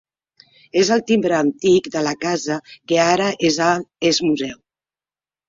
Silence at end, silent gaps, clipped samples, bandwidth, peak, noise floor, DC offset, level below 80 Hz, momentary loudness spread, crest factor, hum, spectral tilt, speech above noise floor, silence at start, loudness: 0.95 s; none; under 0.1%; 7.8 kHz; -2 dBFS; under -90 dBFS; under 0.1%; -60 dBFS; 7 LU; 16 dB; none; -4 dB/octave; over 72 dB; 0.75 s; -18 LUFS